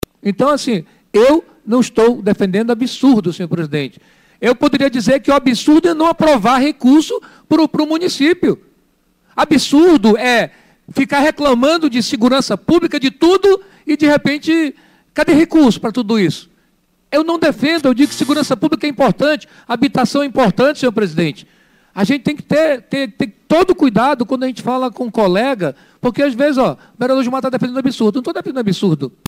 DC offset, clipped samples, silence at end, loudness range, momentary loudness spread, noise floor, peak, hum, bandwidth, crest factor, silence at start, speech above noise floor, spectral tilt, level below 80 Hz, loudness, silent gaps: under 0.1%; under 0.1%; 0.2 s; 3 LU; 9 LU; -59 dBFS; -2 dBFS; none; 16 kHz; 12 dB; 0.25 s; 45 dB; -5.5 dB/octave; -46 dBFS; -14 LUFS; none